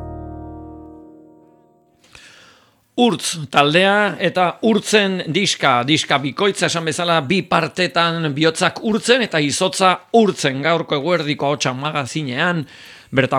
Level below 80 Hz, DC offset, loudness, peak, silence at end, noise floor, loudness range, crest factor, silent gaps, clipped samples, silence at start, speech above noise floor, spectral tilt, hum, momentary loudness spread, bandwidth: -50 dBFS; under 0.1%; -17 LUFS; 0 dBFS; 0 s; -54 dBFS; 4 LU; 18 dB; none; under 0.1%; 0 s; 37 dB; -4 dB/octave; none; 8 LU; 17 kHz